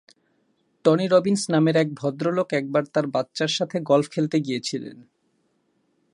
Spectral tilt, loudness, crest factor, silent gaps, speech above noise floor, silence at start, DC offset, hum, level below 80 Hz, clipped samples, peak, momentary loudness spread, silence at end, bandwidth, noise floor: -5.5 dB/octave; -23 LUFS; 20 dB; none; 47 dB; 0.85 s; under 0.1%; none; -72 dBFS; under 0.1%; -4 dBFS; 8 LU; 1.15 s; 11.5 kHz; -69 dBFS